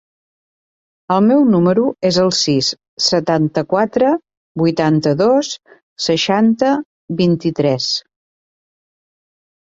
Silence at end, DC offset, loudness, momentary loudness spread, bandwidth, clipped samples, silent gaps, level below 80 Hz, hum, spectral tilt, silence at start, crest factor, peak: 1.7 s; under 0.1%; -15 LUFS; 9 LU; 8 kHz; under 0.1%; 2.88-2.97 s, 4.37-4.55 s, 5.83-5.96 s, 6.85-7.08 s; -56 dBFS; none; -5 dB/octave; 1.1 s; 14 dB; -2 dBFS